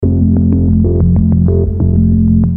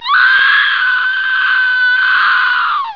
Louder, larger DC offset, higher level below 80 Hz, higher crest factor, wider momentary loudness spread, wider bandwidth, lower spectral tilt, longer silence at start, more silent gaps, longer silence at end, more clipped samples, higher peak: about the same, -11 LUFS vs -10 LUFS; first, 2% vs 0.4%; first, -20 dBFS vs -64 dBFS; about the same, 10 dB vs 12 dB; second, 2 LU vs 5 LU; second, 1.5 kHz vs 5.4 kHz; first, -15 dB/octave vs 1 dB/octave; about the same, 0 s vs 0 s; neither; about the same, 0 s vs 0 s; neither; about the same, 0 dBFS vs 0 dBFS